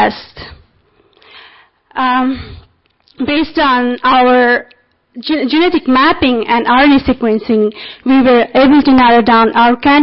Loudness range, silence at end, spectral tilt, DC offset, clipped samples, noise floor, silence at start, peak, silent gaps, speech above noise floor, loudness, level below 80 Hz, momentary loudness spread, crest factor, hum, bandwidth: 8 LU; 0 s; -9.5 dB/octave; under 0.1%; under 0.1%; -53 dBFS; 0 s; -2 dBFS; none; 43 dB; -10 LUFS; -38 dBFS; 11 LU; 10 dB; none; 5.8 kHz